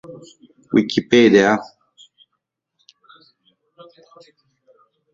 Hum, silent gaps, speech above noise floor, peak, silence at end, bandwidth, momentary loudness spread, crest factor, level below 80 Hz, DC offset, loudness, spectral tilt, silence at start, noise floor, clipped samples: none; none; 61 dB; -2 dBFS; 3.5 s; 7.6 kHz; 10 LU; 20 dB; -60 dBFS; under 0.1%; -15 LUFS; -5.5 dB/octave; 0.1 s; -77 dBFS; under 0.1%